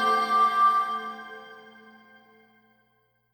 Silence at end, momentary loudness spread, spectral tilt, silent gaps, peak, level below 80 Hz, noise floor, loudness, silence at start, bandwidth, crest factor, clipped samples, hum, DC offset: 1.75 s; 23 LU; -2.5 dB/octave; none; -12 dBFS; -88 dBFS; -69 dBFS; -23 LUFS; 0 s; 19 kHz; 16 dB; under 0.1%; none; under 0.1%